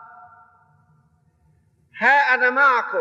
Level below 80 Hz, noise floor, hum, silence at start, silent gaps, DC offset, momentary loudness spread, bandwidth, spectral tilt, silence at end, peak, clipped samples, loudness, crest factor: -74 dBFS; -61 dBFS; none; 1.95 s; none; under 0.1%; 2 LU; 8 kHz; -3.5 dB/octave; 0 s; -4 dBFS; under 0.1%; -16 LUFS; 18 dB